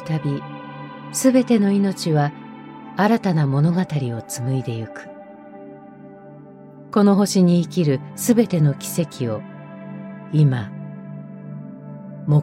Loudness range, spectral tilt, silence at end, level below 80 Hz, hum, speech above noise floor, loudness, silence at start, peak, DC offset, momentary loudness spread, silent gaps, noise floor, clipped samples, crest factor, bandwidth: 6 LU; -6.5 dB/octave; 0 s; -62 dBFS; none; 23 dB; -20 LUFS; 0 s; -4 dBFS; under 0.1%; 22 LU; none; -41 dBFS; under 0.1%; 18 dB; 16.5 kHz